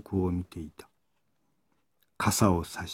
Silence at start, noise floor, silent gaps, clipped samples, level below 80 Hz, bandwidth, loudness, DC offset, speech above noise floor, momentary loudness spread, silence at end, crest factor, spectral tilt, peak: 0.1 s; -78 dBFS; none; under 0.1%; -52 dBFS; 17 kHz; -28 LUFS; under 0.1%; 49 dB; 18 LU; 0 s; 22 dB; -5 dB/octave; -8 dBFS